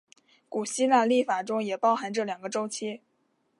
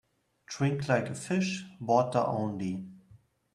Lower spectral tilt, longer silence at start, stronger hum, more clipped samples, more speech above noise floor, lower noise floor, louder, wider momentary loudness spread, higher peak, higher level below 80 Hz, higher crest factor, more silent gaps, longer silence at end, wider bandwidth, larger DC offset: second, -3.5 dB/octave vs -6 dB/octave; about the same, 0.5 s vs 0.5 s; neither; neither; first, 45 dB vs 31 dB; first, -72 dBFS vs -60 dBFS; first, -27 LUFS vs -30 LUFS; about the same, 13 LU vs 12 LU; first, -8 dBFS vs -12 dBFS; second, -84 dBFS vs -68 dBFS; about the same, 20 dB vs 20 dB; neither; first, 0.65 s vs 0.4 s; about the same, 11.5 kHz vs 12 kHz; neither